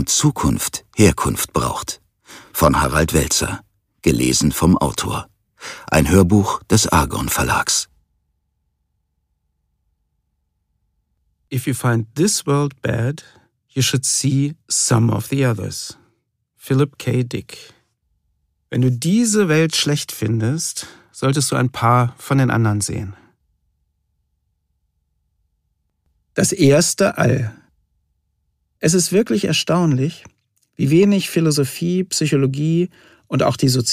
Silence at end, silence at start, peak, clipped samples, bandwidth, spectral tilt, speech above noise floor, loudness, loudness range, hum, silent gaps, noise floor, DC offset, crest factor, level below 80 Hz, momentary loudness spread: 0 s; 0 s; 0 dBFS; under 0.1%; 15.5 kHz; -4.5 dB/octave; 53 dB; -18 LUFS; 6 LU; none; none; -70 dBFS; under 0.1%; 18 dB; -38 dBFS; 12 LU